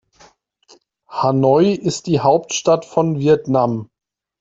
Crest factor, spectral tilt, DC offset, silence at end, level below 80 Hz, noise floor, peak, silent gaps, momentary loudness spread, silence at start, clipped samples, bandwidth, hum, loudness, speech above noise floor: 16 dB; -6 dB/octave; under 0.1%; 0.55 s; -56 dBFS; -52 dBFS; 0 dBFS; none; 7 LU; 1.1 s; under 0.1%; 8 kHz; none; -17 LUFS; 37 dB